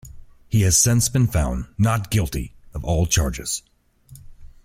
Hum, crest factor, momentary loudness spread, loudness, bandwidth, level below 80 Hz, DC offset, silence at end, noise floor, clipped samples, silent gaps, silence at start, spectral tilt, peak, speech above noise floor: none; 18 dB; 13 LU; -20 LUFS; 16.5 kHz; -34 dBFS; under 0.1%; 0.15 s; -48 dBFS; under 0.1%; none; 0.05 s; -4.5 dB/octave; -4 dBFS; 28 dB